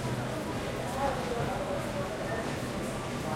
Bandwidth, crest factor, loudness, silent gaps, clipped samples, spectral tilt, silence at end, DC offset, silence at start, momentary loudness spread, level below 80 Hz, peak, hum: 16.5 kHz; 14 dB; -33 LUFS; none; under 0.1%; -5.5 dB/octave; 0 s; under 0.1%; 0 s; 3 LU; -48 dBFS; -18 dBFS; none